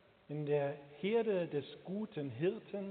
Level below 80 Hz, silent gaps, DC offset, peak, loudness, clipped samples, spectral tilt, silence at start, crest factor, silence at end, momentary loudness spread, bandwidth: -82 dBFS; none; under 0.1%; -24 dBFS; -38 LUFS; under 0.1%; -6 dB/octave; 0.3 s; 14 dB; 0 s; 9 LU; 4.5 kHz